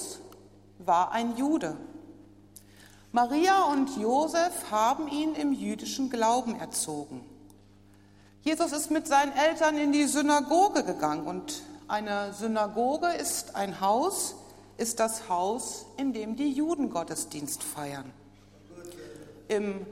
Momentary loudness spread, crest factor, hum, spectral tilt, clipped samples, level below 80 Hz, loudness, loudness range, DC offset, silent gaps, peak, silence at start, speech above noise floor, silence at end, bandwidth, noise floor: 15 LU; 18 dB; none; -3 dB/octave; under 0.1%; -64 dBFS; -28 LUFS; 6 LU; under 0.1%; none; -10 dBFS; 0 s; 28 dB; 0 s; 16 kHz; -56 dBFS